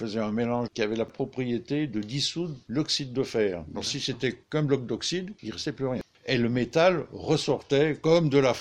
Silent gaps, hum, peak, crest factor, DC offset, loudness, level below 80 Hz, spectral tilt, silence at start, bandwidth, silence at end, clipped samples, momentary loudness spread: none; none; -8 dBFS; 18 dB; under 0.1%; -27 LUFS; -58 dBFS; -5 dB/octave; 0 s; 12 kHz; 0 s; under 0.1%; 9 LU